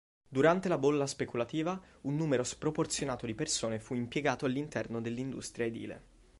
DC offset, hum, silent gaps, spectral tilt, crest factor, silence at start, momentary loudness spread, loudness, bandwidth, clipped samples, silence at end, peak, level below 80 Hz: under 0.1%; none; none; -5 dB/octave; 20 dB; 0.3 s; 9 LU; -33 LUFS; 11.5 kHz; under 0.1%; 0.35 s; -14 dBFS; -62 dBFS